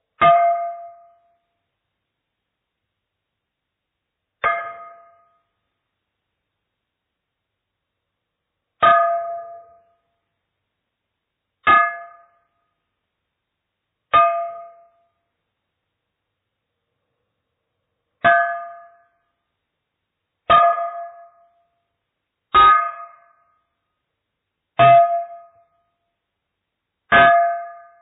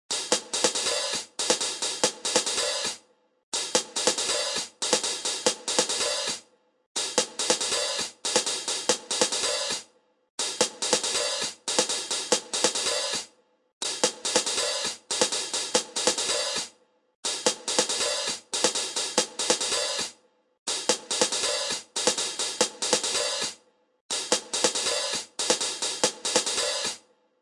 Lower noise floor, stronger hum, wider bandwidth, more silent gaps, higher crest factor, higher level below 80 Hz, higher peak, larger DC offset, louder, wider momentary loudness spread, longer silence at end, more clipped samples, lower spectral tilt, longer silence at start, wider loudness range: first, -80 dBFS vs -56 dBFS; neither; second, 3.9 kHz vs 11.5 kHz; second, none vs 3.43-3.52 s, 6.86-6.95 s, 10.30-10.38 s, 13.73-13.81 s, 17.15-17.23 s, 20.59-20.66 s, 24.01-24.09 s; about the same, 20 dB vs 22 dB; first, -56 dBFS vs -66 dBFS; about the same, -4 dBFS vs -6 dBFS; neither; first, -16 LUFS vs -26 LUFS; first, 23 LU vs 7 LU; second, 0.25 s vs 0.45 s; neither; second, 2 dB/octave vs 0 dB/octave; about the same, 0.2 s vs 0.1 s; first, 13 LU vs 1 LU